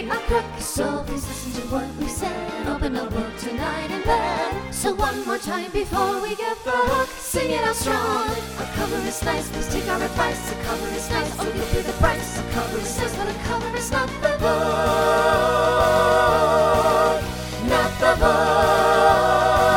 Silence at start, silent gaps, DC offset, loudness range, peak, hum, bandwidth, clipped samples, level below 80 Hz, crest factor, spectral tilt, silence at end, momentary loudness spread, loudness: 0 s; none; under 0.1%; 7 LU; -4 dBFS; none; 20 kHz; under 0.1%; -34 dBFS; 18 dB; -4 dB/octave; 0 s; 10 LU; -22 LUFS